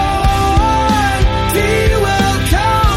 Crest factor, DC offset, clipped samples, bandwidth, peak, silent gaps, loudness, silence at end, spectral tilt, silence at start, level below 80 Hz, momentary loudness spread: 12 dB; under 0.1%; under 0.1%; 16.5 kHz; 0 dBFS; none; -13 LUFS; 0 s; -5 dB/octave; 0 s; -18 dBFS; 1 LU